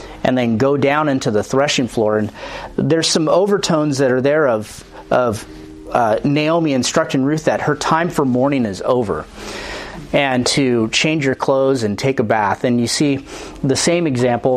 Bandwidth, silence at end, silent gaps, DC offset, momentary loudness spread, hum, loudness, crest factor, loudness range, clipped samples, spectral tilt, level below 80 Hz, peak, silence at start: 15 kHz; 0 s; none; under 0.1%; 11 LU; none; -16 LUFS; 16 dB; 1 LU; under 0.1%; -4.5 dB/octave; -44 dBFS; 0 dBFS; 0 s